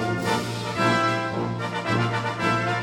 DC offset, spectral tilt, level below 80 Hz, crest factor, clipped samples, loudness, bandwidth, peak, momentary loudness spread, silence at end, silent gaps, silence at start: under 0.1%; -5.5 dB/octave; -56 dBFS; 16 dB; under 0.1%; -24 LUFS; 16 kHz; -10 dBFS; 6 LU; 0 s; none; 0 s